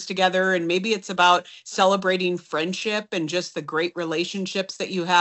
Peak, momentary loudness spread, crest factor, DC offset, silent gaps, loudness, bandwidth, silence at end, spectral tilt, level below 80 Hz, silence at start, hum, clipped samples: -4 dBFS; 9 LU; 20 dB; under 0.1%; none; -23 LUFS; 8.2 kHz; 0 s; -4 dB/octave; -72 dBFS; 0 s; none; under 0.1%